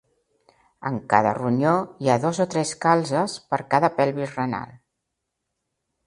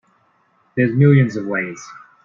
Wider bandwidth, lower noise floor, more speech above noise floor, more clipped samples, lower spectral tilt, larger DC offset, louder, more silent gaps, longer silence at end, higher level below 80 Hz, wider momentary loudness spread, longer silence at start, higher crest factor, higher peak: first, 11.5 kHz vs 7.2 kHz; first, -80 dBFS vs -60 dBFS; first, 58 dB vs 44 dB; neither; second, -5.5 dB/octave vs -8.5 dB/octave; neither; second, -23 LUFS vs -17 LUFS; neither; first, 1.3 s vs 0.3 s; about the same, -62 dBFS vs -58 dBFS; second, 10 LU vs 20 LU; about the same, 0.8 s vs 0.75 s; first, 24 dB vs 16 dB; about the same, 0 dBFS vs -2 dBFS